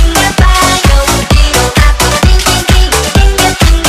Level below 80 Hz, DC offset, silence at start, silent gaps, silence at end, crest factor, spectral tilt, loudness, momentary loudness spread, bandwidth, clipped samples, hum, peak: -10 dBFS; under 0.1%; 0 s; none; 0 s; 6 dB; -3.5 dB/octave; -8 LUFS; 2 LU; 15.5 kHz; 3%; none; 0 dBFS